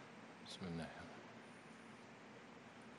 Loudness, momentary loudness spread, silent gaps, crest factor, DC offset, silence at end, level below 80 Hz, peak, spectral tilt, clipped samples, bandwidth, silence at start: -54 LUFS; 10 LU; none; 18 dB; under 0.1%; 0 s; -78 dBFS; -36 dBFS; -5 dB/octave; under 0.1%; 11.5 kHz; 0 s